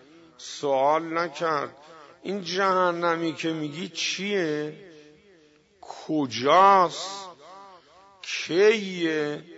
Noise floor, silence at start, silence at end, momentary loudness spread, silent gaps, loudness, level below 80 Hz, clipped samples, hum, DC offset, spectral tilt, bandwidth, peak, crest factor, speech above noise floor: -58 dBFS; 0.4 s; 0 s; 18 LU; none; -24 LUFS; -74 dBFS; under 0.1%; none; under 0.1%; -4 dB/octave; 8 kHz; -6 dBFS; 20 dB; 34 dB